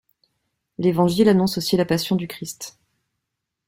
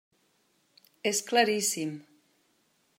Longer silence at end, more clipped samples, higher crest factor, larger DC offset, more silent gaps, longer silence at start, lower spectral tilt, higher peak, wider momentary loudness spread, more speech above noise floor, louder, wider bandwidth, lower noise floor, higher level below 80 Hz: about the same, 1 s vs 0.95 s; neither; second, 18 dB vs 24 dB; neither; neither; second, 0.8 s vs 1.05 s; first, -6 dB/octave vs -2 dB/octave; first, -4 dBFS vs -10 dBFS; first, 18 LU vs 12 LU; first, 61 dB vs 43 dB; first, -20 LUFS vs -28 LUFS; about the same, 16.5 kHz vs 16 kHz; first, -81 dBFS vs -71 dBFS; first, -58 dBFS vs -88 dBFS